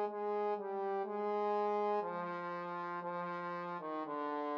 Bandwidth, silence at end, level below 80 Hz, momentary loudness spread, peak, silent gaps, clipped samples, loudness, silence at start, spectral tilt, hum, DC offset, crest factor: 6.4 kHz; 0 s; under -90 dBFS; 7 LU; -26 dBFS; none; under 0.1%; -39 LUFS; 0 s; -4.5 dB/octave; none; under 0.1%; 12 dB